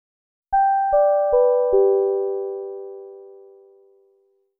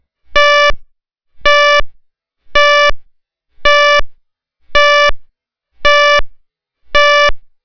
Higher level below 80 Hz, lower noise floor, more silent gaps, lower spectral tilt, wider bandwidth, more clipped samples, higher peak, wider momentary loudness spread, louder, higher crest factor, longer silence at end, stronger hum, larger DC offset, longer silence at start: second, -52 dBFS vs -28 dBFS; first, -63 dBFS vs -58 dBFS; neither; second, 1.5 dB/octave vs -1 dB/octave; second, 1.7 kHz vs 5.4 kHz; second, under 0.1% vs 2%; second, -8 dBFS vs 0 dBFS; first, 18 LU vs 8 LU; second, -19 LUFS vs -10 LUFS; about the same, 14 dB vs 12 dB; first, 1.25 s vs 0.2 s; neither; neither; first, 0.5 s vs 0.3 s